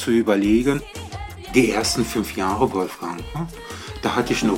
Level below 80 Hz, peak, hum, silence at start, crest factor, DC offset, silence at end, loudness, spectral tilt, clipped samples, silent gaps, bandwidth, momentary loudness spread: -40 dBFS; -4 dBFS; none; 0 s; 18 dB; under 0.1%; 0 s; -21 LUFS; -4.5 dB/octave; under 0.1%; none; 17 kHz; 16 LU